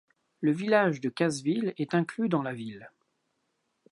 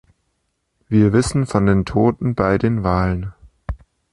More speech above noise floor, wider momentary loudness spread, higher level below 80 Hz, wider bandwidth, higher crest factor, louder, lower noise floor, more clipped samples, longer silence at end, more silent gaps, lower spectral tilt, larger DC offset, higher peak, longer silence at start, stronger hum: second, 49 dB vs 54 dB; second, 13 LU vs 17 LU; second, -78 dBFS vs -34 dBFS; about the same, 11.5 kHz vs 11.5 kHz; first, 22 dB vs 16 dB; second, -28 LUFS vs -18 LUFS; first, -77 dBFS vs -70 dBFS; neither; first, 1.05 s vs 0.35 s; neither; second, -6 dB/octave vs -7.5 dB/octave; neither; second, -8 dBFS vs -2 dBFS; second, 0.4 s vs 0.9 s; neither